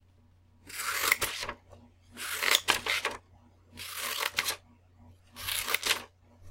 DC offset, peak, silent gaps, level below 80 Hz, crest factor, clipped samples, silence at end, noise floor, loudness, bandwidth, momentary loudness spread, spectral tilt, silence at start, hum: under 0.1%; -4 dBFS; none; -62 dBFS; 32 dB; under 0.1%; 0 s; -62 dBFS; -30 LUFS; 17 kHz; 16 LU; 0.5 dB/octave; 0.65 s; none